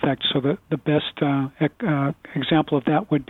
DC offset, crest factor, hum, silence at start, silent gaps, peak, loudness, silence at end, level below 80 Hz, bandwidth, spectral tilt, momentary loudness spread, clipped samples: under 0.1%; 16 dB; none; 0 s; none; -6 dBFS; -23 LUFS; 0.05 s; -56 dBFS; 4.2 kHz; -9 dB/octave; 5 LU; under 0.1%